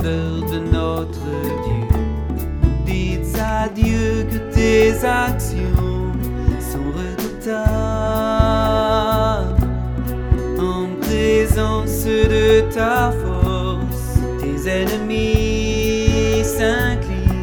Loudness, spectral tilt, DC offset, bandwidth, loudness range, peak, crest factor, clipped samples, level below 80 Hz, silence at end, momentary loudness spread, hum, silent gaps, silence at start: -19 LUFS; -6 dB/octave; under 0.1%; over 20 kHz; 3 LU; 0 dBFS; 18 dB; under 0.1%; -24 dBFS; 0 s; 8 LU; none; none; 0 s